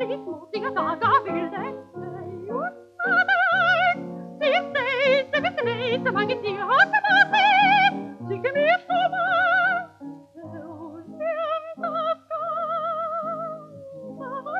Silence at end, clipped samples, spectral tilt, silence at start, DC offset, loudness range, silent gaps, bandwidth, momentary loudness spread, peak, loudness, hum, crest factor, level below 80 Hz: 0 s; under 0.1%; -5 dB/octave; 0 s; under 0.1%; 9 LU; none; 8.6 kHz; 21 LU; -6 dBFS; -22 LUFS; none; 18 dB; -74 dBFS